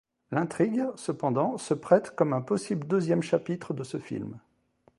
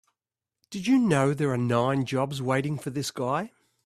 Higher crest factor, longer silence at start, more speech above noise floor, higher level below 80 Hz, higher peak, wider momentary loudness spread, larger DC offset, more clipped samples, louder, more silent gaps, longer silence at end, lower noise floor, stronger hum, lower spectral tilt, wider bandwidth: about the same, 22 dB vs 18 dB; second, 0.3 s vs 0.7 s; second, 38 dB vs 64 dB; second, -70 dBFS vs -64 dBFS; first, -6 dBFS vs -10 dBFS; about the same, 11 LU vs 9 LU; neither; neither; about the same, -28 LUFS vs -26 LUFS; neither; first, 0.6 s vs 0.4 s; second, -66 dBFS vs -89 dBFS; neither; about the same, -7 dB/octave vs -6 dB/octave; second, 11.5 kHz vs 14 kHz